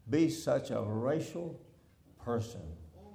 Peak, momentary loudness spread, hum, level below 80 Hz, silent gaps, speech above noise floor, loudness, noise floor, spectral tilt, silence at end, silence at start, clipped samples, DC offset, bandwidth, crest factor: -18 dBFS; 18 LU; none; -62 dBFS; none; 29 dB; -35 LUFS; -62 dBFS; -6.5 dB/octave; 0 s; 0.05 s; under 0.1%; under 0.1%; over 20 kHz; 18 dB